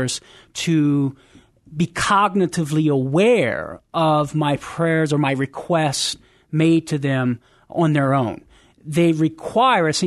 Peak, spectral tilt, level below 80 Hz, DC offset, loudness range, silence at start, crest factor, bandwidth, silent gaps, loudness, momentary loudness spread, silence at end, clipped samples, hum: -4 dBFS; -5.5 dB/octave; -54 dBFS; under 0.1%; 2 LU; 0 s; 16 dB; 12.5 kHz; none; -19 LUFS; 10 LU; 0 s; under 0.1%; none